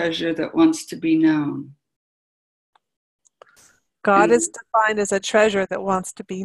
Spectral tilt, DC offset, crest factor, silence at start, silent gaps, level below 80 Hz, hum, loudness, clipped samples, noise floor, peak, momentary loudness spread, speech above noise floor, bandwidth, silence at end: -4 dB/octave; under 0.1%; 18 dB; 0 s; 1.96-2.73 s, 2.97-3.19 s; -60 dBFS; none; -19 LUFS; under 0.1%; -57 dBFS; -2 dBFS; 8 LU; 37 dB; 12 kHz; 0 s